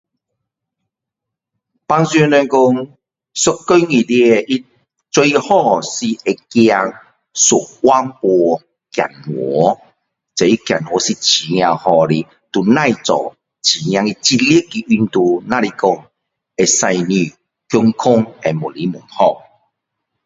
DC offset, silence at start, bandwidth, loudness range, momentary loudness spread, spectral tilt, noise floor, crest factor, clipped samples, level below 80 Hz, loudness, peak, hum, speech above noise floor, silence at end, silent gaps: under 0.1%; 1.9 s; 8 kHz; 2 LU; 10 LU; -4 dB/octave; -82 dBFS; 16 dB; under 0.1%; -56 dBFS; -14 LUFS; 0 dBFS; none; 68 dB; 0.85 s; none